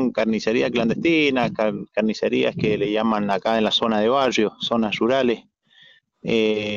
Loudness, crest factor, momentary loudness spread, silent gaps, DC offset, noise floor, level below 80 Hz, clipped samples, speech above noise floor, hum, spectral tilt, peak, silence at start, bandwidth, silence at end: -21 LUFS; 14 dB; 5 LU; none; under 0.1%; -53 dBFS; -56 dBFS; under 0.1%; 33 dB; none; -5.5 dB/octave; -6 dBFS; 0 s; 7.4 kHz; 0 s